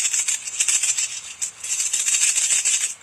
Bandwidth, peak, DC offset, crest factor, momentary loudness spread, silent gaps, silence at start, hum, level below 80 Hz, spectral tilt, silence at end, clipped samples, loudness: 16 kHz; -2 dBFS; under 0.1%; 22 dB; 10 LU; none; 0 s; none; -72 dBFS; 4.5 dB/octave; 0.05 s; under 0.1%; -19 LUFS